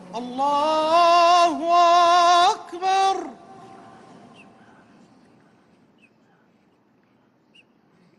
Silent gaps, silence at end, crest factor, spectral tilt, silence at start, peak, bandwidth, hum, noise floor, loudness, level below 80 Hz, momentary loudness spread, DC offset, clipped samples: none; 4.85 s; 14 dB; -2 dB/octave; 0.1 s; -8 dBFS; 11.5 kHz; none; -61 dBFS; -18 LUFS; -70 dBFS; 11 LU; under 0.1%; under 0.1%